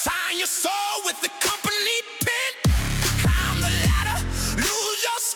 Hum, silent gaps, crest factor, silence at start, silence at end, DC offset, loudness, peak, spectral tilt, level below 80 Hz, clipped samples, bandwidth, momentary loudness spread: none; none; 14 dB; 0 s; 0 s; under 0.1%; -22 LUFS; -8 dBFS; -3 dB/octave; -30 dBFS; under 0.1%; 18 kHz; 3 LU